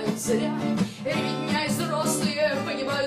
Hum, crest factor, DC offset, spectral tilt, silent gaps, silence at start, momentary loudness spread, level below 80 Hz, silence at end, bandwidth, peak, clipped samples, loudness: none; 14 dB; under 0.1%; -4.5 dB/octave; none; 0 s; 3 LU; -62 dBFS; 0 s; 15.5 kHz; -12 dBFS; under 0.1%; -26 LUFS